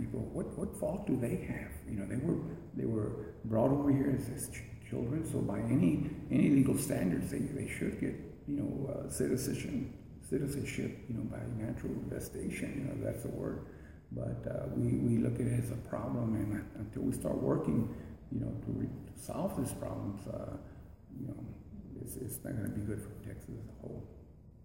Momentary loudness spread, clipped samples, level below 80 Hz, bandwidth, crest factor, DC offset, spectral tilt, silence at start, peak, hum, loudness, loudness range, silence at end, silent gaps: 15 LU; under 0.1%; -54 dBFS; 16 kHz; 18 dB; under 0.1%; -7 dB/octave; 0 s; -18 dBFS; none; -36 LUFS; 10 LU; 0 s; none